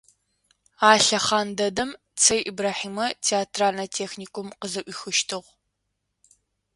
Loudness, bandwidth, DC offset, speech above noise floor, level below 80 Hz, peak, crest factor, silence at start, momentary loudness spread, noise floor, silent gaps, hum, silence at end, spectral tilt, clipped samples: -23 LUFS; 11.5 kHz; under 0.1%; 54 dB; -62 dBFS; 0 dBFS; 24 dB; 0.8 s; 14 LU; -78 dBFS; none; 50 Hz at -55 dBFS; 1.35 s; -1.5 dB/octave; under 0.1%